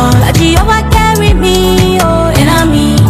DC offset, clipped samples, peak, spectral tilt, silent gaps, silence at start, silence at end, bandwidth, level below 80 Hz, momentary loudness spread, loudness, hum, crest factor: under 0.1%; 0.3%; 0 dBFS; -5.5 dB/octave; none; 0 s; 0 s; 16.5 kHz; -16 dBFS; 1 LU; -8 LUFS; none; 6 dB